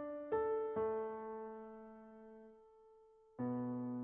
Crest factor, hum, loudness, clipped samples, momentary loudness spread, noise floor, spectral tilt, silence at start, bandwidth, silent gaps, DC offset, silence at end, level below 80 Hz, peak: 16 dB; none; -42 LUFS; under 0.1%; 20 LU; -66 dBFS; -4.5 dB/octave; 0 s; 3.6 kHz; none; under 0.1%; 0 s; -74 dBFS; -28 dBFS